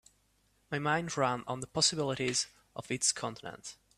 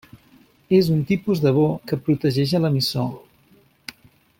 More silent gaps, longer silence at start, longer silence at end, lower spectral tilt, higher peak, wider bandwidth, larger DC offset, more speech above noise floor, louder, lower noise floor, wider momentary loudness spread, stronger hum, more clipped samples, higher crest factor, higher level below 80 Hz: neither; about the same, 0.7 s vs 0.7 s; second, 0.25 s vs 1.2 s; second, -2.5 dB/octave vs -7 dB/octave; second, -14 dBFS vs -6 dBFS; second, 14.5 kHz vs 16.5 kHz; neither; about the same, 38 dB vs 37 dB; second, -32 LUFS vs -20 LUFS; first, -72 dBFS vs -56 dBFS; second, 15 LU vs 21 LU; neither; neither; about the same, 20 dB vs 16 dB; second, -68 dBFS vs -56 dBFS